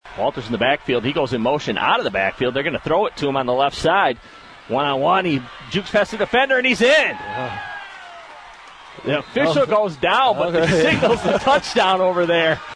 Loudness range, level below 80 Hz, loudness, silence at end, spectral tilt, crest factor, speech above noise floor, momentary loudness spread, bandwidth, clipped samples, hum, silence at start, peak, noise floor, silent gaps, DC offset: 3 LU; -48 dBFS; -18 LUFS; 0 s; -5 dB/octave; 16 dB; 22 dB; 11 LU; 11 kHz; under 0.1%; none; 0.05 s; -4 dBFS; -41 dBFS; none; under 0.1%